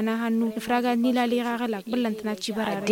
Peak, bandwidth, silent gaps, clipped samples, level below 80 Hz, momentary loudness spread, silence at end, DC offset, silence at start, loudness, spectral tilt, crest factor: -10 dBFS; 17 kHz; none; under 0.1%; -66 dBFS; 6 LU; 0 s; under 0.1%; 0 s; -26 LUFS; -5 dB/octave; 16 dB